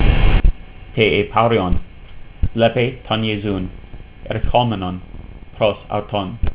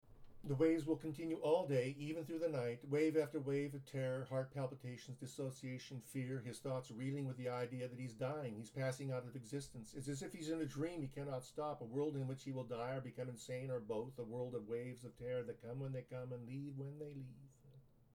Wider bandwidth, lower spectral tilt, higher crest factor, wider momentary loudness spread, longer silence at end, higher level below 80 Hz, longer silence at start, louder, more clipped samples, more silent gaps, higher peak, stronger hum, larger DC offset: second, 4 kHz vs 16.5 kHz; first, -10 dB/octave vs -7 dB/octave; about the same, 16 dB vs 18 dB; first, 18 LU vs 12 LU; second, 0 s vs 0.3 s; first, -22 dBFS vs -72 dBFS; about the same, 0 s vs 0.05 s; first, -19 LUFS vs -44 LUFS; neither; neither; first, 0 dBFS vs -24 dBFS; neither; neither